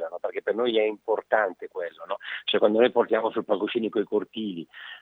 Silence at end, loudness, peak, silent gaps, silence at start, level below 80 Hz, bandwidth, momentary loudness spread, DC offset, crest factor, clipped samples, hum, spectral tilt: 0 s; -26 LUFS; -6 dBFS; none; 0 s; -84 dBFS; 4.3 kHz; 13 LU; under 0.1%; 20 dB; under 0.1%; none; -7 dB/octave